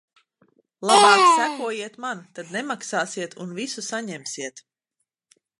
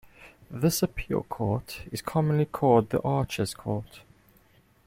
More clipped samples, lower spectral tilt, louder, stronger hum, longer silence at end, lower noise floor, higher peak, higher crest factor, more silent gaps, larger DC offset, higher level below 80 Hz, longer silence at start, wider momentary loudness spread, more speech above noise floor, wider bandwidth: neither; second, -2 dB/octave vs -6 dB/octave; first, -21 LUFS vs -27 LUFS; neither; first, 1 s vs 0.85 s; first, -80 dBFS vs -61 dBFS; first, -2 dBFS vs -8 dBFS; about the same, 22 dB vs 20 dB; neither; neither; second, -80 dBFS vs -50 dBFS; first, 0.8 s vs 0.2 s; first, 18 LU vs 12 LU; first, 58 dB vs 34 dB; second, 11.5 kHz vs 16.5 kHz